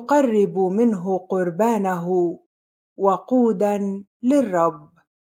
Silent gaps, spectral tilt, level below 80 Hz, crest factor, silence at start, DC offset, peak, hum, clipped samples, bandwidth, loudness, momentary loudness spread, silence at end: 2.46-2.96 s, 4.07-4.20 s; -7.5 dB/octave; -72 dBFS; 16 dB; 0 s; under 0.1%; -4 dBFS; none; under 0.1%; 16 kHz; -21 LUFS; 7 LU; 0.55 s